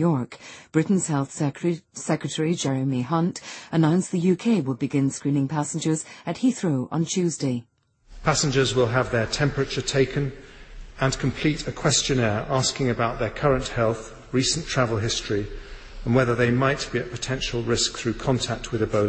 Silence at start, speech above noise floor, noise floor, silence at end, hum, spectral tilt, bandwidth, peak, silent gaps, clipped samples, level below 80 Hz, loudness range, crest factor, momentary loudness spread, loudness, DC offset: 0 s; 23 dB; -47 dBFS; 0 s; none; -5 dB/octave; 8.8 kHz; -6 dBFS; none; under 0.1%; -44 dBFS; 2 LU; 18 dB; 7 LU; -24 LUFS; under 0.1%